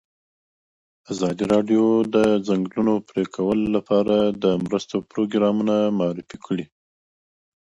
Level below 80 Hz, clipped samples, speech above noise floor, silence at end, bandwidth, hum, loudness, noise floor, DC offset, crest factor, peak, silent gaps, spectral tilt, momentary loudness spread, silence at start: -56 dBFS; under 0.1%; over 69 dB; 1 s; 11 kHz; none; -21 LUFS; under -90 dBFS; under 0.1%; 16 dB; -6 dBFS; none; -7 dB/octave; 10 LU; 1.1 s